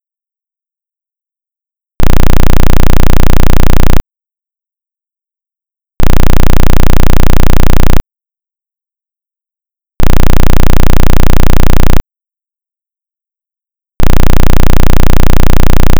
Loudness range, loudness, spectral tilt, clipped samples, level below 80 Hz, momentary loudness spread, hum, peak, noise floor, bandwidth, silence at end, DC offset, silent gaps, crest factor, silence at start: 3 LU; -10 LUFS; -6 dB/octave; 40%; -8 dBFS; 6 LU; none; 0 dBFS; -84 dBFS; 12 kHz; 0 s; under 0.1%; none; 4 dB; 2 s